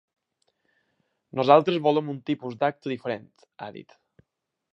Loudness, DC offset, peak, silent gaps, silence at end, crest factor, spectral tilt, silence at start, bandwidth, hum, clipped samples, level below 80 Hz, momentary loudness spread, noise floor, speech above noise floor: -24 LUFS; under 0.1%; -2 dBFS; none; 0.95 s; 24 dB; -7.5 dB/octave; 1.35 s; 6.8 kHz; none; under 0.1%; -76 dBFS; 22 LU; -80 dBFS; 56 dB